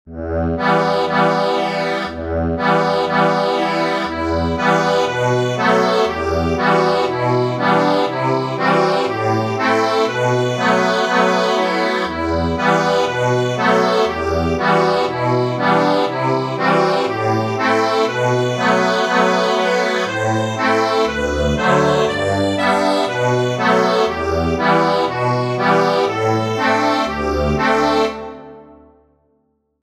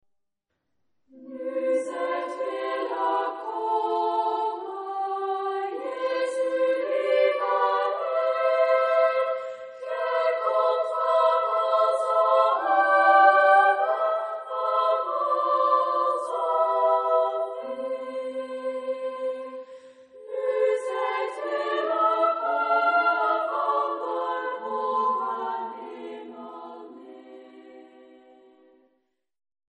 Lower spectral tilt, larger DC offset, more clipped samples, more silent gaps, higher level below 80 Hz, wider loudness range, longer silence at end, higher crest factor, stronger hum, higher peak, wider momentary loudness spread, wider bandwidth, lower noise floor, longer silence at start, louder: first, -5.5 dB/octave vs -2.5 dB/octave; neither; neither; neither; first, -38 dBFS vs -88 dBFS; second, 1 LU vs 10 LU; second, 1.2 s vs 1.95 s; second, 14 dB vs 20 dB; neither; first, -2 dBFS vs -6 dBFS; second, 4 LU vs 12 LU; first, 14.5 kHz vs 10 kHz; second, -64 dBFS vs -79 dBFS; second, 0.05 s vs 1.15 s; first, -16 LUFS vs -24 LUFS